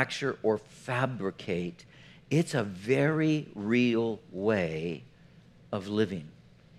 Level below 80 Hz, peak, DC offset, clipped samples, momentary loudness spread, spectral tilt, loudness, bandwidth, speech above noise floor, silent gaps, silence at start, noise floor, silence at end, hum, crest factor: -66 dBFS; -8 dBFS; under 0.1%; under 0.1%; 11 LU; -6.5 dB/octave; -30 LUFS; 13.5 kHz; 27 dB; none; 0 s; -56 dBFS; 0.5 s; none; 22 dB